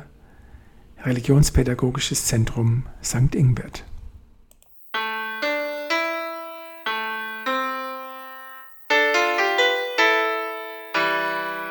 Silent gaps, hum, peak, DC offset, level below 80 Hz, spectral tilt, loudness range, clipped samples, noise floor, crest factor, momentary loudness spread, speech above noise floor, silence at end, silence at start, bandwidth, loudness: none; none; -4 dBFS; under 0.1%; -36 dBFS; -4.5 dB/octave; 6 LU; under 0.1%; -52 dBFS; 20 dB; 16 LU; 31 dB; 0 s; 0 s; 19.5 kHz; -22 LUFS